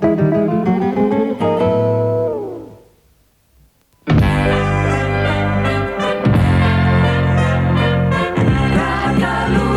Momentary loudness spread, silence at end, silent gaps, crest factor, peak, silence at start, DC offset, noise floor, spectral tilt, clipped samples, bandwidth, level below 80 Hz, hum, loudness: 4 LU; 0 s; none; 12 dB; -2 dBFS; 0 s; under 0.1%; -55 dBFS; -7.5 dB/octave; under 0.1%; 12 kHz; -30 dBFS; none; -15 LUFS